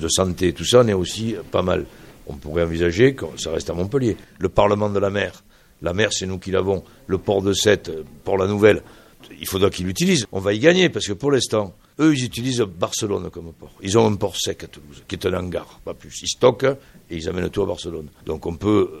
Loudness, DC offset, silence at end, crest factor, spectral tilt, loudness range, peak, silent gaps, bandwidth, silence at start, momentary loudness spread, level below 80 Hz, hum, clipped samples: -21 LUFS; under 0.1%; 0 s; 20 dB; -4.5 dB/octave; 4 LU; 0 dBFS; none; 15.5 kHz; 0 s; 16 LU; -44 dBFS; none; under 0.1%